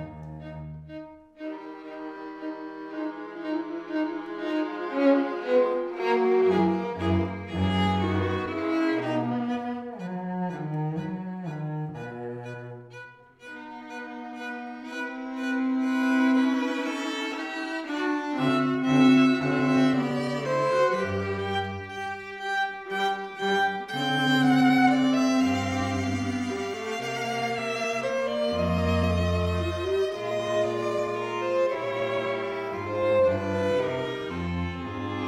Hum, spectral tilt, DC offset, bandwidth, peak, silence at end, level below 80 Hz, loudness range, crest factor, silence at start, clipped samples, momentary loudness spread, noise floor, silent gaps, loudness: none; -6 dB/octave; under 0.1%; 12.5 kHz; -8 dBFS; 0 s; -52 dBFS; 11 LU; 18 dB; 0 s; under 0.1%; 16 LU; -47 dBFS; none; -27 LUFS